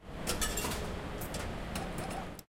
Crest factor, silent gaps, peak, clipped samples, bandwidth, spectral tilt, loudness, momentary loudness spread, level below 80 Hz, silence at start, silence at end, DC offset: 20 dB; none; -18 dBFS; under 0.1%; 16.5 kHz; -3.5 dB/octave; -37 LUFS; 7 LU; -44 dBFS; 0 s; 0.05 s; under 0.1%